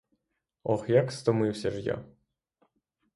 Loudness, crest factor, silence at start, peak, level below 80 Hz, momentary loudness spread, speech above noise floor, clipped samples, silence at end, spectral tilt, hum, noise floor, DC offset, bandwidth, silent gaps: -29 LUFS; 20 dB; 0.65 s; -10 dBFS; -62 dBFS; 11 LU; 54 dB; under 0.1%; 1.1 s; -7 dB/octave; none; -81 dBFS; under 0.1%; 11.5 kHz; none